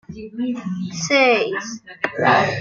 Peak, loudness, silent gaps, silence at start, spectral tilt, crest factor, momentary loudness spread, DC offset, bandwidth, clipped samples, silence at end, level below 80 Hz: -2 dBFS; -19 LUFS; none; 0.1 s; -4 dB/octave; 18 dB; 13 LU; under 0.1%; 7.6 kHz; under 0.1%; 0 s; -58 dBFS